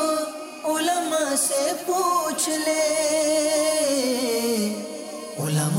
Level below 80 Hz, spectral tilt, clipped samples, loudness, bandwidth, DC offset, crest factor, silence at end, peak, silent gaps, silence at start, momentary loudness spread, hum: -74 dBFS; -3.5 dB/octave; under 0.1%; -23 LUFS; 16 kHz; under 0.1%; 12 dB; 0 s; -12 dBFS; none; 0 s; 10 LU; none